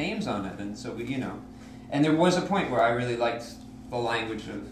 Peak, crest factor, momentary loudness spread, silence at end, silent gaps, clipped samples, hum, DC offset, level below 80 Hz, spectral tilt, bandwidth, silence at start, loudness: -10 dBFS; 18 dB; 17 LU; 0 s; none; under 0.1%; none; under 0.1%; -54 dBFS; -5.5 dB/octave; 13.5 kHz; 0 s; -28 LUFS